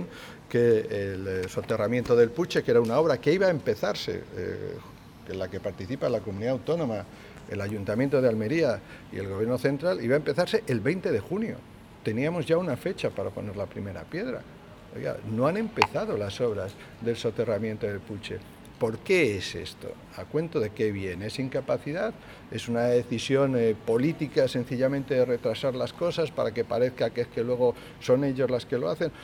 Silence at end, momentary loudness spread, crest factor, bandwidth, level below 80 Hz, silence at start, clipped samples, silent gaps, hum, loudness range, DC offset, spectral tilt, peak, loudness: 0 s; 13 LU; 28 dB; 16 kHz; -58 dBFS; 0 s; under 0.1%; none; none; 6 LU; under 0.1%; -6.5 dB/octave; 0 dBFS; -28 LUFS